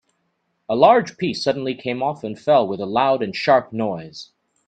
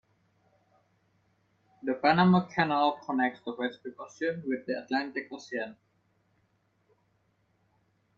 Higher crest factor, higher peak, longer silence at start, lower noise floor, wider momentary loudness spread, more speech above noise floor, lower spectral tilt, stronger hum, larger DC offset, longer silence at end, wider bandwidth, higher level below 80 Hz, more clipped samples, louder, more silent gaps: about the same, 20 dB vs 22 dB; first, 0 dBFS vs -10 dBFS; second, 0.7 s vs 1.85 s; about the same, -71 dBFS vs -72 dBFS; second, 12 LU vs 15 LU; first, 51 dB vs 43 dB; about the same, -6 dB/octave vs -7 dB/octave; neither; neither; second, 0.45 s vs 2.45 s; first, 9 kHz vs 7 kHz; first, -64 dBFS vs -70 dBFS; neither; first, -19 LUFS vs -29 LUFS; neither